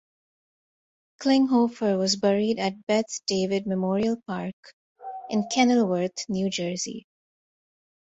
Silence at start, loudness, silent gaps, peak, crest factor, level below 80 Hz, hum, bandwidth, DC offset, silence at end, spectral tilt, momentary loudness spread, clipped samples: 1.2 s; -25 LUFS; 2.83-2.87 s, 4.53-4.63 s, 4.73-4.96 s; -8 dBFS; 20 dB; -66 dBFS; none; 8.2 kHz; under 0.1%; 1.15 s; -4.5 dB/octave; 12 LU; under 0.1%